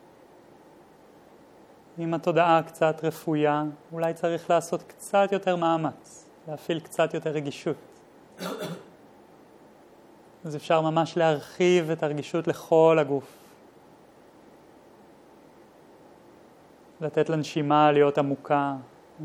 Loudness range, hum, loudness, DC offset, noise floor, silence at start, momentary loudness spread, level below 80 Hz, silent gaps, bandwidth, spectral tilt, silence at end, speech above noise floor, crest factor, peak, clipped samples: 9 LU; none; -25 LUFS; under 0.1%; -53 dBFS; 1.95 s; 17 LU; -76 dBFS; none; 16 kHz; -6 dB/octave; 0 s; 29 dB; 20 dB; -8 dBFS; under 0.1%